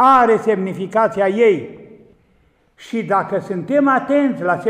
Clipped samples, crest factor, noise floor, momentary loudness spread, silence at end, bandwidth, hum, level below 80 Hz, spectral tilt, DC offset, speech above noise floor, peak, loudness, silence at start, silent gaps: under 0.1%; 14 dB; -57 dBFS; 9 LU; 0 s; 10 kHz; none; -60 dBFS; -7 dB/octave; under 0.1%; 41 dB; -2 dBFS; -17 LUFS; 0 s; none